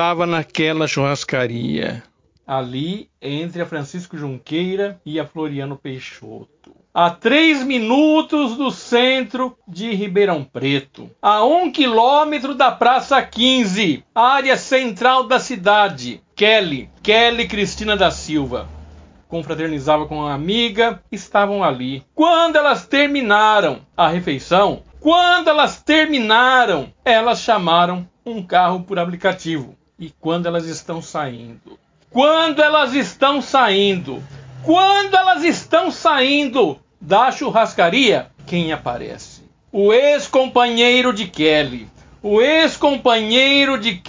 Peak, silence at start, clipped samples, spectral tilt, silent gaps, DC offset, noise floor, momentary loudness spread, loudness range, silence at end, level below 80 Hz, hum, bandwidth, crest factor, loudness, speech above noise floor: 0 dBFS; 0 s; under 0.1%; -4.5 dB/octave; none; under 0.1%; -42 dBFS; 14 LU; 8 LU; 0 s; -48 dBFS; none; 7.6 kHz; 16 dB; -16 LUFS; 26 dB